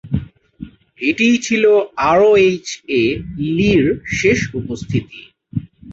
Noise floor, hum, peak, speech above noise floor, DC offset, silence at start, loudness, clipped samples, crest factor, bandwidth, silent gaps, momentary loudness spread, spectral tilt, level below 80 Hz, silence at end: -36 dBFS; none; -2 dBFS; 21 dB; under 0.1%; 0.05 s; -16 LUFS; under 0.1%; 14 dB; 8 kHz; none; 15 LU; -5.5 dB/octave; -40 dBFS; 0 s